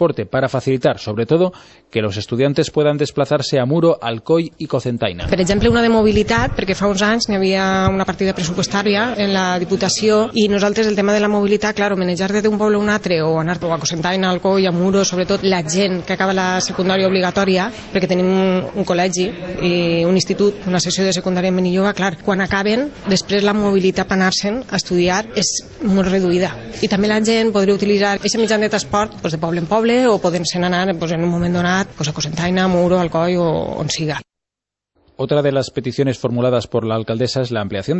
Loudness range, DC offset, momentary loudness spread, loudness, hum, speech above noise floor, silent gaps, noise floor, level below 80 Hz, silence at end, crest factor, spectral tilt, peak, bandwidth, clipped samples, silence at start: 2 LU; under 0.1%; 6 LU; -17 LUFS; none; 69 dB; none; -85 dBFS; -40 dBFS; 0 s; 14 dB; -5 dB/octave; -2 dBFS; 8.4 kHz; under 0.1%; 0 s